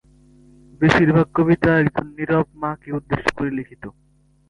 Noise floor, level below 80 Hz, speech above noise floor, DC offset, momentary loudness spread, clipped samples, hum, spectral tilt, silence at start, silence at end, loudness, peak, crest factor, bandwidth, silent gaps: -51 dBFS; -46 dBFS; 32 dB; under 0.1%; 14 LU; under 0.1%; none; -7.5 dB/octave; 0.8 s; 0.6 s; -19 LUFS; -2 dBFS; 18 dB; 11 kHz; none